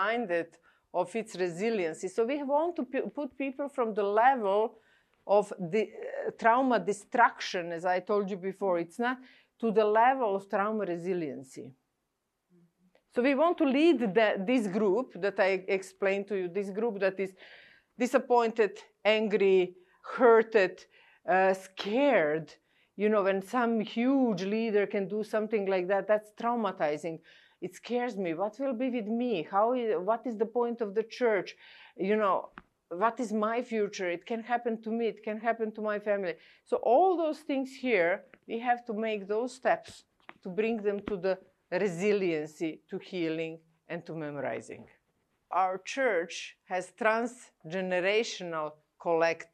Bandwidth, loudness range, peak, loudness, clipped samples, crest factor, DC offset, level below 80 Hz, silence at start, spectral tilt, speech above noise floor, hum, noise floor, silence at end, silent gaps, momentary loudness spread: 12.5 kHz; 5 LU; -10 dBFS; -30 LUFS; under 0.1%; 20 dB; under 0.1%; -78 dBFS; 0 s; -5.5 dB/octave; 53 dB; none; -82 dBFS; 0.1 s; none; 12 LU